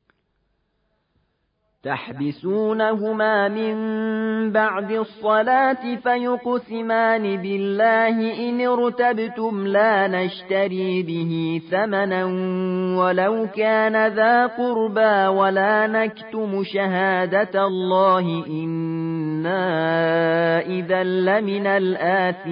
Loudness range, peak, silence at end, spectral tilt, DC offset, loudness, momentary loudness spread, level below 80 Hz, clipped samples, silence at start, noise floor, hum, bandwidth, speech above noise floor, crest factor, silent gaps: 3 LU; -6 dBFS; 0 s; -11 dB/octave; under 0.1%; -20 LUFS; 8 LU; -70 dBFS; under 0.1%; 1.85 s; -70 dBFS; none; 5.2 kHz; 50 dB; 14 dB; none